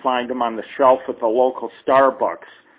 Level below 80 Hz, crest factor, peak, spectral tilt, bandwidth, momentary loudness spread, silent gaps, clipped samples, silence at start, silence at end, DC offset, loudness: -62 dBFS; 16 dB; -2 dBFS; -8.5 dB/octave; 4 kHz; 9 LU; none; under 0.1%; 0.05 s; 0.4 s; under 0.1%; -19 LUFS